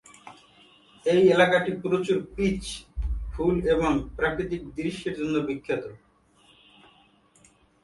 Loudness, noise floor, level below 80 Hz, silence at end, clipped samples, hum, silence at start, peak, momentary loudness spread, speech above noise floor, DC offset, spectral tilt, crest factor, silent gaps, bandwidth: -26 LUFS; -60 dBFS; -40 dBFS; 1.9 s; under 0.1%; none; 0.25 s; -6 dBFS; 13 LU; 35 dB; under 0.1%; -6 dB/octave; 22 dB; none; 11.5 kHz